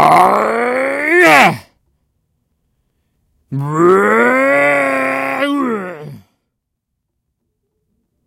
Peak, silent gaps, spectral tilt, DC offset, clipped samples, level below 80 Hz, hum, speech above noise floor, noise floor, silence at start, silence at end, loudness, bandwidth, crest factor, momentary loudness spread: 0 dBFS; none; -5 dB/octave; under 0.1%; under 0.1%; -60 dBFS; none; 63 dB; -74 dBFS; 0 s; 2.1 s; -12 LUFS; 17 kHz; 14 dB; 15 LU